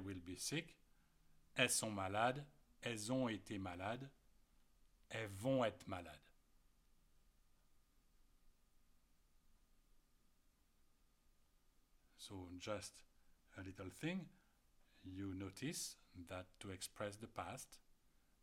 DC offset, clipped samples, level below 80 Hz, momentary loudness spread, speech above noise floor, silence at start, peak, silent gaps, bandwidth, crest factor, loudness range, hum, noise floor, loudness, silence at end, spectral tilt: under 0.1%; under 0.1%; -74 dBFS; 19 LU; 30 dB; 0 s; -20 dBFS; none; 16 kHz; 30 dB; 13 LU; none; -76 dBFS; -46 LUFS; 0.65 s; -3.5 dB/octave